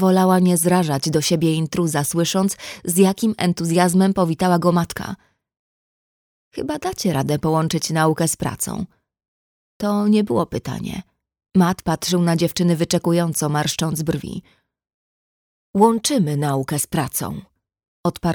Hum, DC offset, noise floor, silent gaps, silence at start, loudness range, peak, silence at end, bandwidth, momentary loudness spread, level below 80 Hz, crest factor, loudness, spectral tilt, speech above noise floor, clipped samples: none; under 0.1%; under -90 dBFS; 5.59-6.51 s, 9.28-9.80 s, 14.94-15.74 s, 17.88-18.04 s; 0 s; 4 LU; -2 dBFS; 0 s; over 20 kHz; 12 LU; -50 dBFS; 18 dB; -19 LUFS; -5.5 dB/octave; over 71 dB; under 0.1%